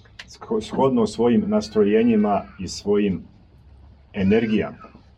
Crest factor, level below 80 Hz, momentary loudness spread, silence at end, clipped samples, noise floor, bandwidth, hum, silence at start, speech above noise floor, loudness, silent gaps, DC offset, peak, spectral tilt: 16 dB; -50 dBFS; 14 LU; 0.3 s; under 0.1%; -49 dBFS; 9.4 kHz; none; 0.2 s; 29 dB; -21 LUFS; none; under 0.1%; -6 dBFS; -6.5 dB/octave